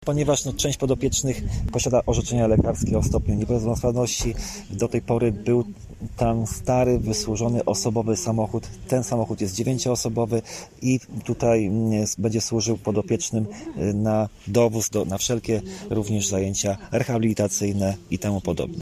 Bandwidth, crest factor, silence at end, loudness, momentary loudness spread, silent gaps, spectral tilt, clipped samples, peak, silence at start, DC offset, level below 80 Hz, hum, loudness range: 14 kHz; 18 dB; 0 s; -24 LUFS; 7 LU; none; -5.5 dB/octave; under 0.1%; -6 dBFS; 0 s; under 0.1%; -38 dBFS; none; 2 LU